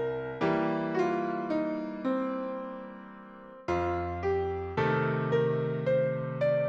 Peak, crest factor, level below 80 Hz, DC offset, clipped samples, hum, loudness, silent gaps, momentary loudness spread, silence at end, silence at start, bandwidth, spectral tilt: -16 dBFS; 14 dB; -56 dBFS; under 0.1%; under 0.1%; none; -30 LUFS; none; 13 LU; 0 s; 0 s; 7.6 kHz; -8.5 dB/octave